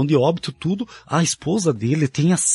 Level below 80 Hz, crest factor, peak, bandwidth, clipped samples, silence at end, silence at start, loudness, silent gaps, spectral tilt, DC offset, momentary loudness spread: -56 dBFS; 14 dB; -6 dBFS; 11.5 kHz; under 0.1%; 0 s; 0 s; -20 LUFS; none; -5 dB/octave; under 0.1%; 7 LU